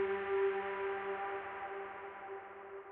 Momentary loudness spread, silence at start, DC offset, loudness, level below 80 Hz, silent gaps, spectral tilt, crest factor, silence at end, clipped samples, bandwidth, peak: 13 LU; 0 s; under 0.1%; -40 LUFS; -74 dBFS; none; -2.5 dB/octave; 14 dB; 0 s; under 0.1%; 4 kHz; -24 dBFS